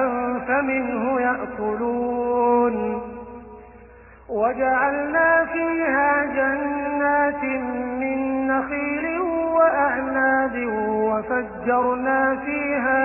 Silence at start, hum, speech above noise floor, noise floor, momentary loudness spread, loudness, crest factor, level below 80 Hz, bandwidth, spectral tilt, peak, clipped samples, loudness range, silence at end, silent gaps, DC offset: 0 s; none; 24 dB; -46 dBFS; 7 LU; -22 LUFS; 16 dB; -50 dBFS; 3 kHz; -11.5 dB/octave; -6 dBFS; under 0.1%; 3 LU; 0 s; none; under 0.1%